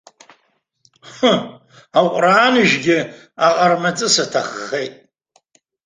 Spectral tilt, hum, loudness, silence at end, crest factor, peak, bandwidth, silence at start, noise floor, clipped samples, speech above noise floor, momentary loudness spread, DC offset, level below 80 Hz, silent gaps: -3.5 dB/octave; none; -16 LUFS; 0.95 s; 18 dB; 0 dBFS; 10 kHz; 1.05 s; -65 dBFS; under 0.1%; 49 dB; 12 LU; under 0.1%; -62 dBFS; none